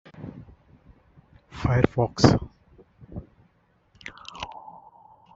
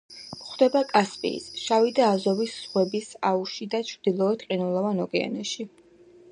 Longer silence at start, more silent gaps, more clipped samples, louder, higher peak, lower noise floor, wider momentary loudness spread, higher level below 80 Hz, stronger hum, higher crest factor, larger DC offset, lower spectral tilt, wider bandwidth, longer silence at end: about the same, 0.2 s vs 0.1 s; neither; neither; about the same, -24 LUFS vs -25 LUFS; first, -2 dBFS vs -6 dBFS; first, -64 dBFS vs -53 dBFS; first, 24 LU vs 10 LU; first, -46 dBFS vs -72 dBFS; neither; first, 26 dB vs 20 dB; neither; first, -6.5 dB/octave vs -5 dB/octave; second, 7.8 kHz vs 11 kHz; about the same, 0.75 s vs 0.65 s